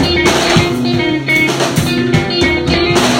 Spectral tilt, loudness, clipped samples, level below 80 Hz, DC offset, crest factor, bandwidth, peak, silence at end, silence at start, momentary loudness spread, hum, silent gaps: -4.5 dB/octave; -12 LUFS; under 0.1%; -30 dBFS; under 0.1%; 12 dB; 16.5 kHz; 0 dBFS; 0 s; 0 s; 3 LU; none; none